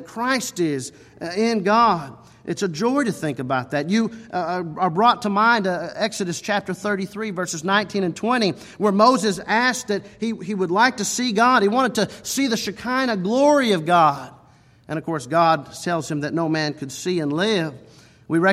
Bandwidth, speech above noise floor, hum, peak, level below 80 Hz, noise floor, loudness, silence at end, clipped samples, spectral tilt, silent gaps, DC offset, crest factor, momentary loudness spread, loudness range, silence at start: 15.5 kHz; 31 dB; none; -2 dBFS; -62 dBFS; -52 dBFS; -21 LUFS; 0 s; under 0.1%; -4.5 dB/octave; none; under 0.1%; 18 dB; 11 LU; 4 LU; 0 s